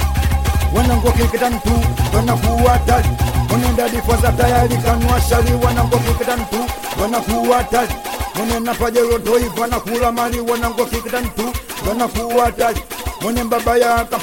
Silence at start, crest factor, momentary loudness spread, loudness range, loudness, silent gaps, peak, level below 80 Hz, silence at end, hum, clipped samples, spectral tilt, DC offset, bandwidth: 0 s; 16 dB; 7 LU; 3 LU; -16 LUFS; none; 0 dBFS; -24 dBFS; 0 s; none; under 0.1%; -5.5 dB/octave; 0.3%; 17 kHz